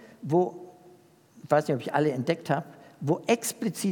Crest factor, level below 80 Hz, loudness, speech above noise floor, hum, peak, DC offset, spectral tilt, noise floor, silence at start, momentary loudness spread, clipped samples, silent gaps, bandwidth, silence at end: 20 dB; -80 dBFS; -28 LUFS; 30 dB; none; -8 dBFS; under 0.1%; -5.5 dB/octave; -56 dBFS; 0 s; 7 LU; under 0.1%; none; 18 kHz; 0 s